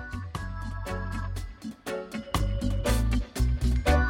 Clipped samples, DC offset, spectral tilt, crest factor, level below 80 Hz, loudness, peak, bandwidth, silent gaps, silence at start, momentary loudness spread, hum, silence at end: under 0.1%; under 0.1%; -6 dB/octave; 18 dB; -30 dBFS; -31 LUFS; -10 dBFS; 16.5 kHz; none; 0 s; 10 LU; none; 0 s